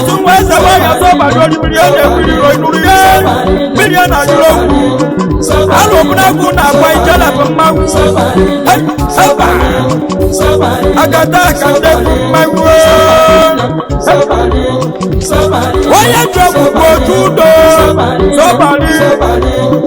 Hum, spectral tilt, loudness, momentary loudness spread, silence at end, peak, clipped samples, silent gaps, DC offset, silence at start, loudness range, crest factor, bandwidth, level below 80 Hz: none; -5 dB/octave; -7 LUFS; 6 LU; 0 s; 0 dBFS; 2%; none; under 0.1%; 0 s; 2 LU; 6 dB; over 20 kHz; -20 dBFS